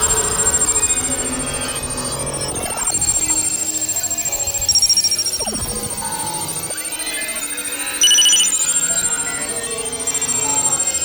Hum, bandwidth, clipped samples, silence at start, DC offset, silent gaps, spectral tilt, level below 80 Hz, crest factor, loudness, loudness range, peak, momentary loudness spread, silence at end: none; over 20 kHz; under 0.1%; 0 s; under 0.1%; none; 0 dB/octave; -40 dBFS; 16 dB; -16 LUFS; 3 LU; -4 dBFS; 10 LU; 0 s